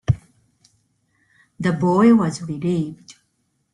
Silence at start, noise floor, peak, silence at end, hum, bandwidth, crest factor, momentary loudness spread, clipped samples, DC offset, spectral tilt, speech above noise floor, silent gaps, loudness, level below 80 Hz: 0.1 s; -69 dBFS; -4 dBFS; 0.65 s; none; 11 kHz; 18 dB; 11 LU; under 0.1%; under 0.1%; -7.5 dB/octave; 51 dB; none; -19 LUFS; -48 dBFS